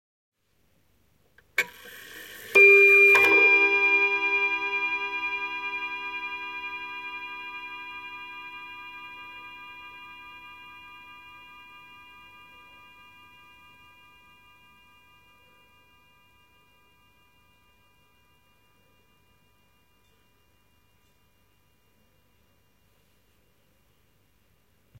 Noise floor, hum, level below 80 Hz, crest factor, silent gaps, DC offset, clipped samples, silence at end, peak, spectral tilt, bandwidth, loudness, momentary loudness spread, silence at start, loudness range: -69 dBFS; 50 Hz at -70 dBFS; -70 dBFS; 22 dB; none; under 0.1%; under 0.1%; 14.45 s; -6 dBFS; -2.5 dB/octave; 16.5 kHz; -20 LUFS; 30 LU; 1.6 s; 26 LU